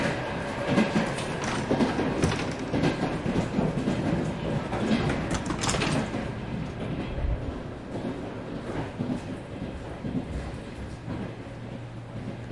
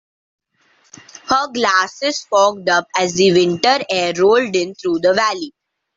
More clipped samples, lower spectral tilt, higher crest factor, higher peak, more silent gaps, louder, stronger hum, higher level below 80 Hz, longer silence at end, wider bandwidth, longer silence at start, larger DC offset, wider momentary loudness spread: neither; first, -5.5 dB/octave vs -3.5 dB/octave; about the same, 18 dB vs 14 dB; second, -10 dBFS vs -2 dBFS; neither; second, -30 LUFS vs -16 LUFS; neither; first, -42 dBFS vs -58 dBFS; second, 0 s vs 0.45 s; first, 11.5 kHz vs 7.8 kHz; second, 0 s vs 1.25 s; neither; first, 12 LU vs 7 LU